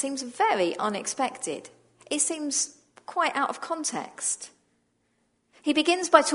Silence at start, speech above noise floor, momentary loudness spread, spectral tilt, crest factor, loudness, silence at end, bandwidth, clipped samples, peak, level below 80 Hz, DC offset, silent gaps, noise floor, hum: 0 s; 45 dB; 10 LU; -1.5 dB/octave; 26 dB; -27 LUFS; 0 s; 11 kHz; under 0.1%; -2 dBFS; -80 dBFS; under 0.1%; none; -71 dBFS; none